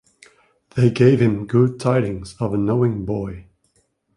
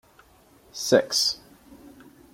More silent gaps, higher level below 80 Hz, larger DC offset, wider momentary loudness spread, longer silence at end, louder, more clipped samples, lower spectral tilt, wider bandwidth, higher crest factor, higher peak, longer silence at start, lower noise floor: neither; first, -46 dBFS vs -64 dBFS; neither; second, 12 LU vs 17 LU; first, 0.75 s vs 0.45 s; first, -19 LUFS vs -23 LUFS; neither; first, -8.5 dB/octave vs -2.5 dB/octave; second, 11 kHz vs 16.5 kHz; second, 18 dB vs 24 dB; about the same, -2 dBFS vs -4 dBFS; about the same, 0.75 s vs 0.75 s; first, -65 dBFS vs -56 dBFS